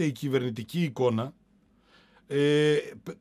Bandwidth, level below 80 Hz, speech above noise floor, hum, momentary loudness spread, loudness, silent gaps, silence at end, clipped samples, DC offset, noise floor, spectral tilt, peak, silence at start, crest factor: 15 kHz; -70 dBFS; 37 dB; none; 10 LU; -27 LUFS; none; 0.05 s; under 0.1%; under 0.1%; -63 dBFS; -6.5 dB/octave; -12 dBFS; 0 s; 16 dB